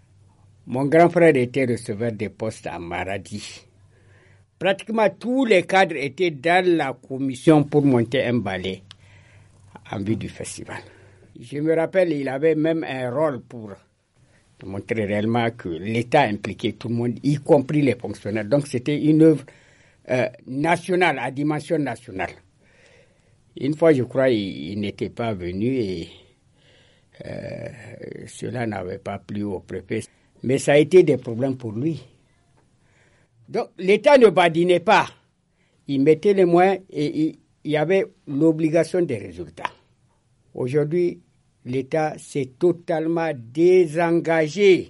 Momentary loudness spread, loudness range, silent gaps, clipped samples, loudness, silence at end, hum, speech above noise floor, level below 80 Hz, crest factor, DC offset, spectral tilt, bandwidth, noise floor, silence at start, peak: 17 LU; 9 LU; none; under 0.1%; -21 LUFS; 0 s; none; 44 dB; -60 dBFS; 18 dB; under 0.1%; -6.5 dB/octave; 11.5 kHz; -64 dBFS; 0.65 s; -4 dBFS